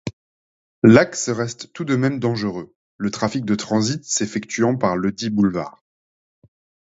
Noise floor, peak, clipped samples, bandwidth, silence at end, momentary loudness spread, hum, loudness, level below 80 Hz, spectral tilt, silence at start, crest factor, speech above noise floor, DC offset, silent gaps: under -90 dBFS; 0 dBFS; under 0.1%; 8 kHz; 1.15 s; 14 LU; none; -20 LUFS; -54 dBFS; -5 dB/octave; 0.05 s; 20 dB; over 71 dB; under 0.1%; 0.13-0.82 s, 2.76-2.99 s